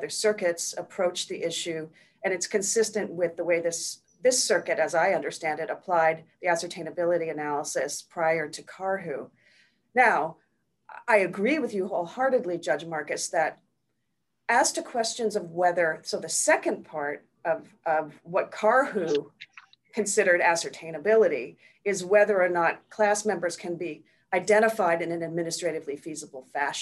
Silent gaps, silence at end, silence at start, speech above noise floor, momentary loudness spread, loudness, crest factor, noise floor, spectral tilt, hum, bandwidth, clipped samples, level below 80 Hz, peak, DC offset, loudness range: none; 0 s; 0 s; 54 dB; 12 LU; -26 LUFS; 20 dB; -80 dBFS; -2.5 dB/octave; none; 13 kHz; under 0.1%; -78 dBFS; -8 dBFS; under 0.1%; 4 LU